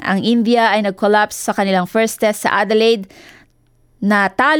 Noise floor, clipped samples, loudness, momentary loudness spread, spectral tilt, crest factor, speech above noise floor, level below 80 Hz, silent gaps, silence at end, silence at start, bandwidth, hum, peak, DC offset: -55 dBFS; under 0.1%; -15 LUFS; 5 LU; -4.5 dB/octave; 14 dB; 40 dB; -58 dBFS; none; 0 s; 0 s; 19 kHz; none; -2 dBFS; under 0.1%